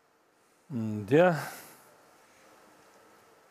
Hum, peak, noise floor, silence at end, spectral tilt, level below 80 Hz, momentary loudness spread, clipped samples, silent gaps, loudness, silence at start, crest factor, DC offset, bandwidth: none; -10 dBFS; -67 dBFS; 1.85 s; -7 dB/octave; -78 dBFS; 22 LU; under 0.1%; none; -28 LUFS; 0.7 s; 22 dB; under 0.1%; 15.5 kHz